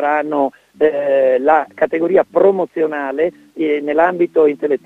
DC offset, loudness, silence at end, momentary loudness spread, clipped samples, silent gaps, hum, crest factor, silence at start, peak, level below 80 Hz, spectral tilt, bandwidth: under 0.1%; -16 LUFS; 0.1 s; 6 LU; under 0.1%; none; none; 14 dB; 0 s; 0 dBFS; -60 dBFS; -7.5 dB/octave; 4.2 kHz